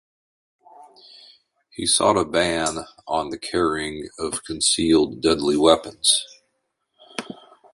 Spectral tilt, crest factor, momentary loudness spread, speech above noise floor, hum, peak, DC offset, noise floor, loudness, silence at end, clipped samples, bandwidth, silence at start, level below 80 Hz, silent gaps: -2.5 dB/octave; 22 dB; 17 LU; 53 dB; none; -2 dBFS; under 0.1%; -74 dBFS; -20 LUFS; 0.4 s; under 0.1%; 11.5 kHz; 0.8 s; -50 dBFS; none